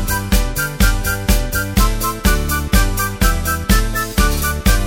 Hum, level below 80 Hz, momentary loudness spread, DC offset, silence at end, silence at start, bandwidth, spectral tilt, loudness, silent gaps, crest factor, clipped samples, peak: none; -18 dBFS; 3 LU; under 0.1%; 0 s; 0 s; 17 kHz; -4 dB/octave; -17 LUFS; none; 14 dB; under 0.1%; 0 dBFS